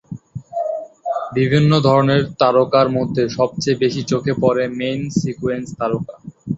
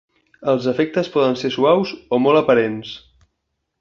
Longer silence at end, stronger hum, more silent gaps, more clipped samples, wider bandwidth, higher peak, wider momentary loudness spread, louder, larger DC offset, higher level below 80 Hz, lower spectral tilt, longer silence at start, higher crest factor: second, 0 s vs 0.85 s; neither; neither; neither; first, 8 kHz vs 7.2 kHz; about the same, -2 dBFS vs -2 dBFS; about the same, 12 LU vs 12 LU; about the same, -18 LUFS vs -18 LUFS; neither; first, -50 dBFS vs -58 dBFS; about the same, -6.5 dB/octave vs -6.5 dB/octave; second, 0.1 s vs 0.4 s; about the same, 16 dB vs 16 dB